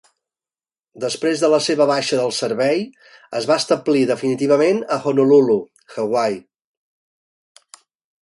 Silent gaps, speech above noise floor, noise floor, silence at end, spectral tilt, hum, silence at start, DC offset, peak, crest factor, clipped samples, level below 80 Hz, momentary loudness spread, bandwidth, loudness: none; over 73 dB; under -90 dBFS; 1.85 s; -4.5 dB/octave; none; 0.95 s; under 0.1%; -2 dBFS; 16 dB; under 0.1%; -68 dBFS; 12 LU; 11.5 kHz; -18 LUFS